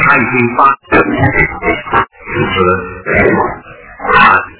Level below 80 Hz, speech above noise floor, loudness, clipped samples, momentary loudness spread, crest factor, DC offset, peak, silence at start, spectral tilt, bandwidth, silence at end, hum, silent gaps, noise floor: -32 dBFS; 20 dB; -11 LUFS; 1%; 9 LU; 12 dB; under 0.1%; 0 dBFS; 0 s; -9 dB/octave; 4 kHz; 0.05 s; none; none; -31 dBFS